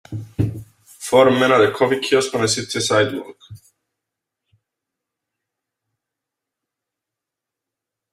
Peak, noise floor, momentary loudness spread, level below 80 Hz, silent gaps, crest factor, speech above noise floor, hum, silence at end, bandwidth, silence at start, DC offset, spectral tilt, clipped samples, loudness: -2 dBFS; -85 dBFS; 17 LU; -52 dBFS; none; 20 dB; 68 dB; none; 4.55 s; 15.5 kHz; 0.1 s; under 0.1%; -4 dB/octave; under 0.1%; -17 LUFS